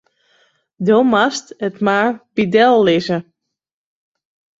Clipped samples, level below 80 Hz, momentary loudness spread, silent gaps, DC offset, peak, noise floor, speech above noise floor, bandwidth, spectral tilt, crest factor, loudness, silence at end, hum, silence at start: under 0.1%; -60 dBFS; 11 LU; none; under 0.1%; -2 dBFS; -59 dBFS; 44 dB; 8 kHz; -5.5 dB/octave; 16 dB; -15 LUFS; 1.4 s; none; 0.8 s